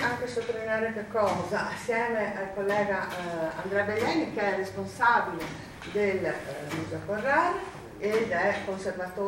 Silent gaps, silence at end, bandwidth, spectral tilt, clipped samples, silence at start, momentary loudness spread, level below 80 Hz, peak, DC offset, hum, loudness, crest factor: none; 0 s; 16.5 kHz; -5 dB/octave; under 0.1%; 0 s; 9 LU; -58 dBFS; -10 dBFS; under 0.1%; none; -29 LUFS; 18 dB